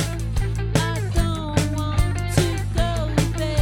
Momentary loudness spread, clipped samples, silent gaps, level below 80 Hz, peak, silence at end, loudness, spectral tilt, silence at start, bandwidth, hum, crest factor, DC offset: 3 LU; under 0.1%; none; -28 dBFS; -4 dBFS; 0 s; -23 LUFS; -5.5 dB/octave; 0 s; 17 kHz; none; 16 dB; under 0.1%